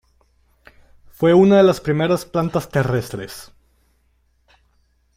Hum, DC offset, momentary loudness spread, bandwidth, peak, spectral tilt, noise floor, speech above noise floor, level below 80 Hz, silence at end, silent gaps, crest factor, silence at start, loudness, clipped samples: none; under 0.1%; 19 LU; 16 kHz; -4 dBFS; -7 dB/octave; -62 dBFS; 45 dB; -50 dBFS; 1.75 s; none; 16 dB; 1.2 s; -17 LUFS; under 0.1%